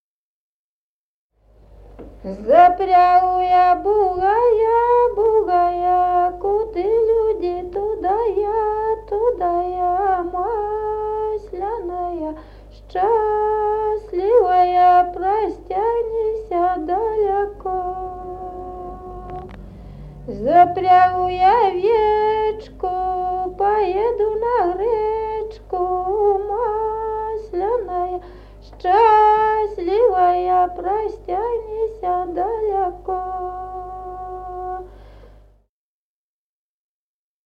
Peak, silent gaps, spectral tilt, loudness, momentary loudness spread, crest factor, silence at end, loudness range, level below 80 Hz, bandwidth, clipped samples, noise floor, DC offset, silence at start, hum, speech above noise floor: -2 dBFS; none; -7.5 dB/octave; -18 LUFS; 17 LU; 18 dB; 2.2 s; 9 LU; -42 dBFS; 5.8 kHz; under 0.1%; under -90 dBFS; under 0.1%; 1.75 s; 50 Hz at -45 dBFS; over 73 dB